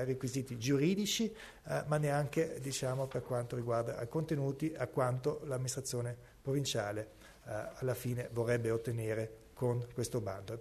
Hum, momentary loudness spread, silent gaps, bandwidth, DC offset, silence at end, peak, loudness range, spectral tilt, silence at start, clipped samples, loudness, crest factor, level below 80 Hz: none; 9 LU; none; 13.5 kHz; under 0.1%; 0 s; -20 dBFS; 3 LU; -5.5 dB/octave; 0 s; under 0.1%; -37 LUFS; 16 dB; -64 dBFS